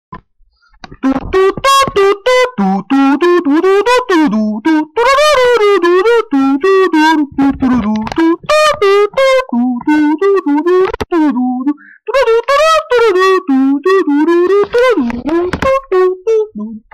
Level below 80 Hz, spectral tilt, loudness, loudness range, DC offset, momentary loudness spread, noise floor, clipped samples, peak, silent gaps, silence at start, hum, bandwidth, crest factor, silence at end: -38 dBFS; -5 dB/octave; -11 LUFS; 2 LU; under 0.1%; 6 LU; -51 dBFS; under 0.1%; -6 dBFS; none; 0.1 s; none; 15 kHz; 6 dB; 0.15 s